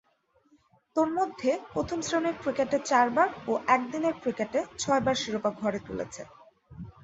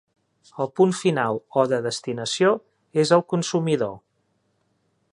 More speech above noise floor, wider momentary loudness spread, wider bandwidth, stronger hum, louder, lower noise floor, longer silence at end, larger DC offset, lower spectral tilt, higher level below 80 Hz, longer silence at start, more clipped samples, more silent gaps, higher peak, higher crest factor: second, 40 dB vs 48 dB; first, 12 LU vs 9 LU; second, 8.2 kHz vs 11 kHz; neither; second, -28 LUFS vs -23 LUFS; about the same, -68 dBFS vs -70 dBFS; second, 0.15 s vs 1.15 s; neither; about the same, -4 dB/octave vs -5 dB/octave; first, -60 dBFS vs -68 dBFS; first, 0.95 s vs 0.55 s; neither; neither; second, -8 dBFS vs -4 dBFS; about the same, 20 dB vs 20 dB